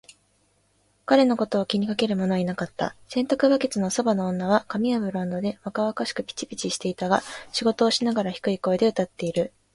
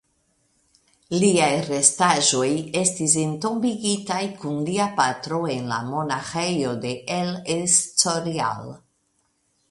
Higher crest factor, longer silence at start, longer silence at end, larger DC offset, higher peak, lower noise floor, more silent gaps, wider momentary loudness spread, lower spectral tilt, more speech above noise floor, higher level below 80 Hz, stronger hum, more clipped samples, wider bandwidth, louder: about the same, 20 dB vs 24 dB; about the same, 1.1 s vs 1.1 s; second, 0.25 s vs 0.95 s; neither; second, -4 dBFS vs 0 dBFS; about the same, -66 dBFS vs -69 dBFS; neither; about the same, 8 LU vs 9 LU; first, -5 dB/octave vs -3 dB/octave; second, 42 dB vs 46 dB; about the same, -62 dBFS vs -62 dBFS; neither; neither; about the same, 11.5 kHz vs 11.5 kHz; about the same, -24 LUFS vs -22 LUFS